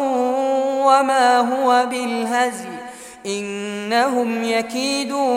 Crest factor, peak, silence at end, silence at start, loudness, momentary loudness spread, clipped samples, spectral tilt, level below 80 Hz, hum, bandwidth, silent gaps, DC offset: 16 dB; -2 dBFS; 0 s; 0 s; -19 LUFS; 12 LU; under 0.1%; -3 dB/octave; -66 dBFS; none; 16 kHz; none; under 0.1%